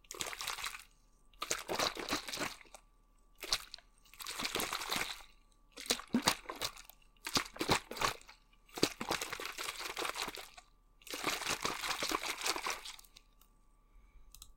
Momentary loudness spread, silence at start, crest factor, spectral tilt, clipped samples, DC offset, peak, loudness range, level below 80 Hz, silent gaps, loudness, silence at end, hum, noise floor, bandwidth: 16 LU; 0.05 s; 30 dB; -1.5 dB/octave; under 0.1%; under 0.1%; -10 dBFS; 3 LU; -62 dBFS; none; -37 LUFS; 0 s; none; -66 dBFS; 17 kHz